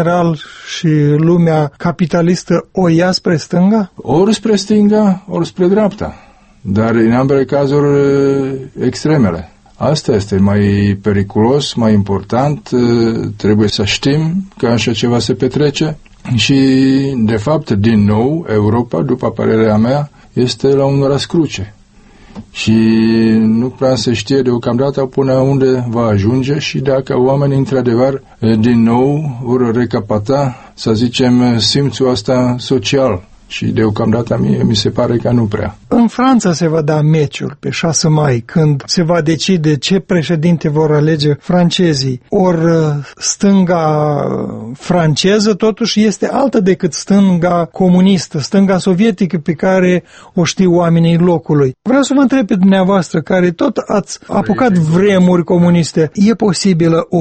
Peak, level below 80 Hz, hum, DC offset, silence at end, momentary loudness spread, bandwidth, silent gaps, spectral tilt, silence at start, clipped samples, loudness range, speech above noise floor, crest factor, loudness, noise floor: 0 dBFS; -42 dBFS; none; under 0.1%; 0 s; 6 LU; 8.8 kHz; none; -6 dB/octave; 0 s; under 0.1%; 2 LU; 30 dB; 12 dB; -12 LUFS; -41 dBFS